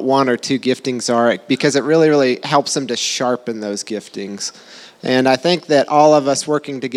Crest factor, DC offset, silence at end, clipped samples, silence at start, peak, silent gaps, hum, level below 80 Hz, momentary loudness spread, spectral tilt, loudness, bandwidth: 16 dB; under 0.1%; 0 s; under 0.1%; 0 s; 0 dBFS; none; none; -72 dBFS; 13 LU; -4 dB/octave; -16 LUFS; 14 kHz